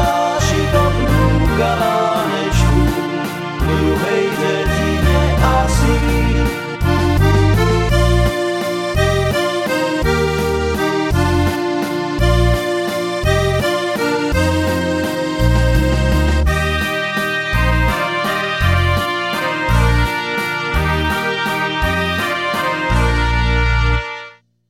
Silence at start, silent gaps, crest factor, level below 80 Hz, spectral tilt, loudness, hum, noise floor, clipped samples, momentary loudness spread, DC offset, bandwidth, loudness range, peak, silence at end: 0 s; none; 14 dB; -22 dBFS; -5.5 dB/octave; -16 LUFS; none; -38 dBFS; under 0.1%; 4 LU; under 0.1%; 16.5 kHz; 2 LU; 0 dBFS; 0.4 s